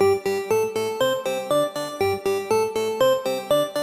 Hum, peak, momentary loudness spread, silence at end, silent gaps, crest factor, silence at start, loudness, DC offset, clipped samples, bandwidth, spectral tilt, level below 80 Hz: none; -8 dBFS; 4 LU; 0 s; none; 14 dB; 0 s; -23 LUFS; under 0.1%; under 0.1%; 15.5 kHz; -4 dB/octave; -60 dBFS